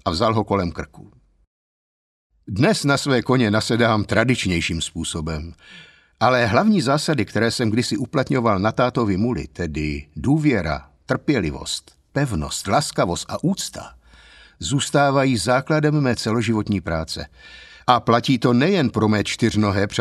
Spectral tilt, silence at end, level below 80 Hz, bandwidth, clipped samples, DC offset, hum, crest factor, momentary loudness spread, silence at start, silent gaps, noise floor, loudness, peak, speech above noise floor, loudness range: -5.5 dB/octave; 0 s; -42 dBFS; 13.5 kHz; under 0.1%; under 0.1%; none; 20 dB; 11 LU; 0.05 s; 1.47-2.30 s; -48 dBFS; -20 LUFS; 0 dBFS; 28 dB; 3 LU